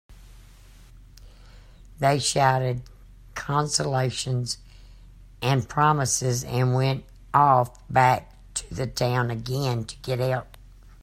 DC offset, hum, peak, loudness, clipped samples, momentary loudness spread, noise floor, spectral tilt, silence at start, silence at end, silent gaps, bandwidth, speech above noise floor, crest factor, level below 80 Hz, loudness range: under 0.1%; none; -4 dBFS; -24 LUFS; under 0.1%; 12 LU; -49 dBFS; -4.5 dB/octave; 0.1 s; 0.15 s; none; 15.5 kHz; 25 dB; 22 dB; -48 dBFS; 5 LU